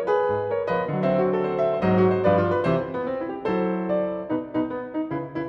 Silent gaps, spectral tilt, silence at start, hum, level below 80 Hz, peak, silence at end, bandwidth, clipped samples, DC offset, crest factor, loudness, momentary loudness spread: none; -9.5 dB/octave; 0 s; none; -56 dBFS; -8 dBFS; 0 s; 6 kHz; under 0.1%; under 0.1%; 16 dB; -24 LUFS; 9 LU